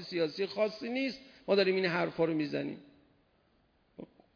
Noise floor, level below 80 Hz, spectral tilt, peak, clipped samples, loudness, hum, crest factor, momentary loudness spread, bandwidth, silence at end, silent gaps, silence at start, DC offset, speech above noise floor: -70 dBFS; -74 dBFS; -6.5 dB/octave; -14 dBFS; under 0.1%; -32 LUFS; none; 20 dB; 21 LU; 5.4 kHz; 0.3 s; none; 0 s; under 0.1%; 39 dB